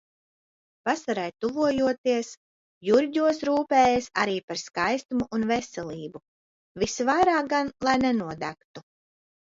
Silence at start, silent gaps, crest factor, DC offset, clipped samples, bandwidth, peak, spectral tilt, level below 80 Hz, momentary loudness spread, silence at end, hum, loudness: 0.85 s; 1.98-2.04 s, 2.37-2.81 s, 4.43-4.48 s, 5.05-5.09 s, 6.28-6.75 s, 8.65-8.74 s; 18 dB; under 0.1%; under 0.1%; 7.8 kHz; -8 dBFS; -4.5 dB/octave; -58 dBFS; 14 LU; 0.75 s; none; -25 LUFS